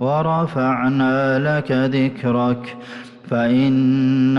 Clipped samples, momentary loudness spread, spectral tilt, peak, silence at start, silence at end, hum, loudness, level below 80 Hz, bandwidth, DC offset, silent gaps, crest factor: under 0.1%; 11 LU; -8.5 dB/octave; -8 dBFS; 0 s; 0 s; none; -18 LUFS; -56 dBFS; 6.2 kHz; under 0.1%; none; 10 dB